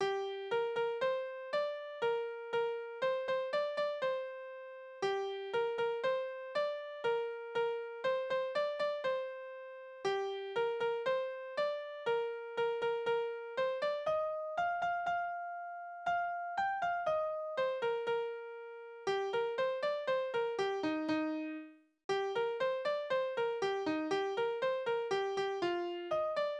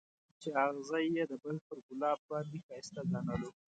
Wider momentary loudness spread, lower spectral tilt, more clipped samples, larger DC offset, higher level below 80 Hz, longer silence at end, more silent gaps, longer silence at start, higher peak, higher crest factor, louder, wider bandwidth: second, 6 LU vs 12 LU; second, -4.5 dB/octave vs -6.5 dB/octave; neither; neither; second, -78 dBFS vs -66 dBFS; second, 0 s vs 0.25 s; second, 22.04-22.09 s vs 1.61-1.70 s, 1.83-1.89 s, 2.19-2.29 s, 2.63-2.69 s; second, 0 s vs 0.4 s; second, -22 dBFS vs -18 dBFS; second, 14 dB vs 20 dB; about the same, -36 LUFS vs -38 LUFS; about the same, 9.8 kHz vs 9 kHz